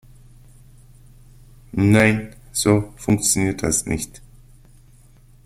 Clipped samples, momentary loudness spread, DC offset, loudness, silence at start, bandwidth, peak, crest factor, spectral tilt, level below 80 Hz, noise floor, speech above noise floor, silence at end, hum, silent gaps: under 0.1%; 12 LU; under 0.1%; -19 LUFS; 1.75 s; 15.5 kHz; -2 dBFS; 22 dB; -4.5 dB/octave; -44 dBFS; -49 dBFS; 31 dB; 1.3 s; none; none